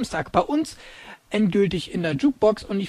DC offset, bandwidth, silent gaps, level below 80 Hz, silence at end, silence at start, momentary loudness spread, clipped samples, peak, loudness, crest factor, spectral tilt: under 0.1%; 13 kHz; none; -48 dBFS; 0 s; 0 s; 18 LU; under 0.1%; -4 dBFS; -23 LUFS; 18 dB; -6 dB/octave